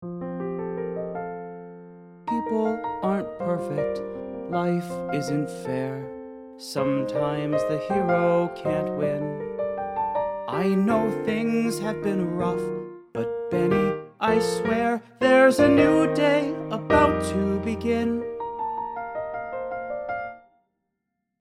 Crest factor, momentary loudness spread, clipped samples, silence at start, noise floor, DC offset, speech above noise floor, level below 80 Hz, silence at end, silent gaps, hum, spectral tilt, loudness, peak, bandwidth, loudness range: 20 dB; 13 LU; under 0.1%; 0 s; -80 dBFS; under 0.1%; 57 dB; -52 dBFS; 1.05 s; none; none; -6.5 dB/octave; -25 LUFS; -4 dBFS; 15.5 kHz; 9 LU